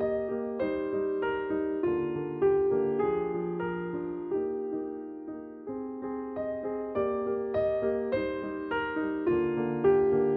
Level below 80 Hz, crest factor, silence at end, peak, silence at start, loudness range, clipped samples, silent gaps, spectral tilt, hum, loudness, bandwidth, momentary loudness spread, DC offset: -58 dBFS; 16 dB; 0 s; -14 dBFS; 0 s; 6 LU; under 0.1%; none; -10.5 dB/octave; none; -30 LUFS; 4.6 kHz; 10 LU; under 0.1%